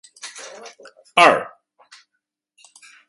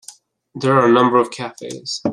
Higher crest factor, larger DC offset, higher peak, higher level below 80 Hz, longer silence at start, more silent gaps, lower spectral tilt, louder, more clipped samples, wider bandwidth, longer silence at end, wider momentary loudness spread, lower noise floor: first, 24 dB vs 16 dB; neither; about the same, 0 dBFS vs -2 dBFS; second, -70 dBFS vs -64 dBFS; first, 0.25 s vs 0.1 s; neither; second, -2.5 dB/octave vs -5.5 dB/octave; about the same, -15 LUFS vs -16 LUFS; neither; about the same, 11.5 kHz vs 12 kHz; first, 1.6 s vs 0 s; first, 26 LU vs 16 LU; first, -78 dBFS vs -44 dBFS